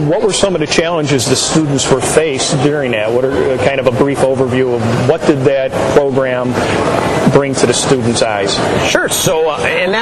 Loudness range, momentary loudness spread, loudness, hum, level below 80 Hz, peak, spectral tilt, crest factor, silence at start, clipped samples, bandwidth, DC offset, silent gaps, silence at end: 1 LU; 2 LU; -12 LUFS; none; -38 dBFS; 0 dBFS; -4.5 dB/octave; 12 dB; 0 s; under 0.1%; 13.5 kHz; under 0.1%; none; 0 s